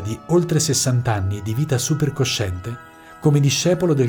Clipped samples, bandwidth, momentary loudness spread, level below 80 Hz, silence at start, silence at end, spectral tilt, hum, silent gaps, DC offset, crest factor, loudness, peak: under 0.1%; over 20 kHz; 8 LU; -48 dBFS; 0 s; 0 s; -5 dB/octave; none; none; under 0.1%; 14 dB; -19 LUFS; -4 dBFS